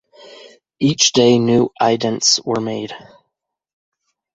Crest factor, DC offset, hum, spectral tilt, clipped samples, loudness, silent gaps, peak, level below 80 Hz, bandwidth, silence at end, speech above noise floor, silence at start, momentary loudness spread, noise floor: 18 dB; under 0.1%; none; -3.5 dB/octave; under 0.1%; -15 LUFS; none; 0 dBFS; -56 dBFS; 8 kHz; 1.4 s; 61 dB; 0.45 s; 14 LU; -77 dBFS